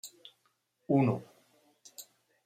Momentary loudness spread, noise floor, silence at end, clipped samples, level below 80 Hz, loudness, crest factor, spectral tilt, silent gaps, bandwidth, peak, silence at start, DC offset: 23 LU; -76 dBFS; 0.45 s; under 0.1%; -76 dBFS; -30 LUFS; 20 dB; -7 dB/octave; none; 16 kHz; -16 dBFS; 0.05 s; under 0.1%